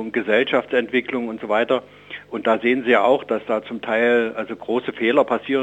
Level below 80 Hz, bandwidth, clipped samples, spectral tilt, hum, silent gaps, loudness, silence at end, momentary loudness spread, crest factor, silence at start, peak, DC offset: -64 dBFS; 8.2 kHz; under 0.1%; -6 dB/octave; 50 Hz at -55 dBFS; none; -20 LUFS; 0 s; 9 LU; 18 dB; 0 s; -2 dBFS; under 0.1%